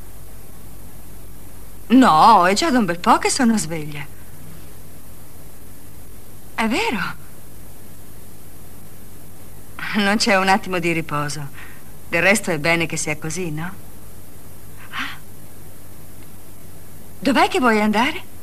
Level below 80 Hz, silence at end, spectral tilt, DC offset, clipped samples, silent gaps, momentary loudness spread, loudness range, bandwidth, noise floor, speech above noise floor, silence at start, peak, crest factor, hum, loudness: -46 dBFS; 0.05 s; -4 dB/octave; 4%; under 0.1%; none; 27 LU; 15 LU; 15.5 kHz; -42 dBFS; 25 dB; 0 s; -2 dBFS; 20 dB; none; -18 LUFS